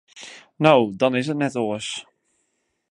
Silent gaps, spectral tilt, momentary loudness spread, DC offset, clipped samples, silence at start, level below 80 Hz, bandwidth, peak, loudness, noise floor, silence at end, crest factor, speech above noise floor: none; -5.5 dB/octave; 23 LU; under 0.1%; under 0.1%; 0.15 s; -68 dBFS; 11 kHz; 0 dBFS; -21 LUFS; -72 dBFS; 0.9 s; 22 dB; 52 dB